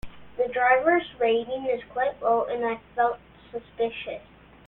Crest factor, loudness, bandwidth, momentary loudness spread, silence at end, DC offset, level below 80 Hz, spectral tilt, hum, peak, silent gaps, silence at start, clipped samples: 18 dB; -25 LUFS; 4.1 kHz; 19 LU; 0.45 s; under 0.1%; -56 dBFS; -7 dB/octave; none; -8 dBFS; none; 0.05 s; under 0.1%